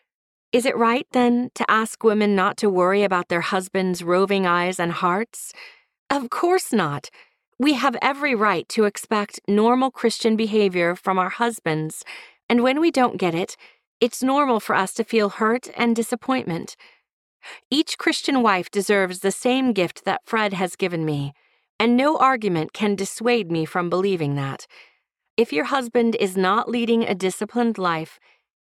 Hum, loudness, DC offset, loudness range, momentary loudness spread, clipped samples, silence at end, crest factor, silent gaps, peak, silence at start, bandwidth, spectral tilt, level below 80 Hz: none; -21 LUFS; under 0.1%; 3 LU; 8 LU; under 0.1%; 0.55 s; 18 dB; 5.99-6.06 s, 7.47-7.52 s, 12.43-12.49 s, 13.87-14.00 s, 17.13-17.40 s, 17.65-17.71 s, 21.70-21.79 s, 25.30-25.37 s; -4 dBFS; 0.55 s; 15 kHz; -5 dB/octave; -68 dBFS